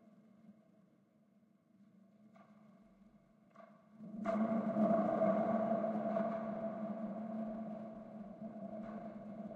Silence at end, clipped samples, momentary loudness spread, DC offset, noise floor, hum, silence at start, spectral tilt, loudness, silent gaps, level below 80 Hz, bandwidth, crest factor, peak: 0 s; under 0.1%; 16 LU; under 0.1%; -71 dBFS; none; 0.15 s; -9.5 dB/octave; -39 LUFS; none; -80 dBFS; 4.7 kHz; 18 dB; -22 dBFS